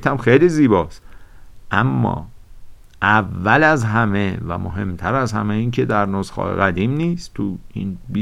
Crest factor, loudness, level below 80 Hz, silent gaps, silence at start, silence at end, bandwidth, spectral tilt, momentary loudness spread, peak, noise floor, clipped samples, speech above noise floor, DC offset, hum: 18 dB; -18 LUFS; -40 dBFS; none; 0 s; 0 s; 12 kHz; -7 dB/octave; 12 LU; 0 dBFS; -38 dBFS; under 0.1%; 20 dB; under 0.1%; none